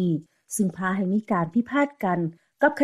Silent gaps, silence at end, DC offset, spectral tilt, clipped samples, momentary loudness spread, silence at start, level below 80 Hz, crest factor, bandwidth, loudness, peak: none; 0 s; under 0.1%; -6.5 dB/octave; under 0.1%; 6 LU; 0 s; -66 dBFS; 16 dB; 14.5 kHz; -25 LUFS; -8 dBFS